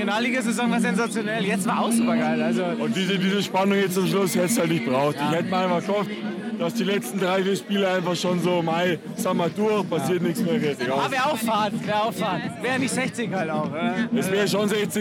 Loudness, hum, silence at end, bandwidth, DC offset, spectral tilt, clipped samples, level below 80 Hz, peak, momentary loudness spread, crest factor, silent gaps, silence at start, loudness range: -23 LUFS; none; 0 s; 16.5 kHz; under 0.1%; -5 dB/octave; under 0.1%; -68 dBFS; -8 dBFS; 4 LU; 14 dB; none; 0 s; 2 LU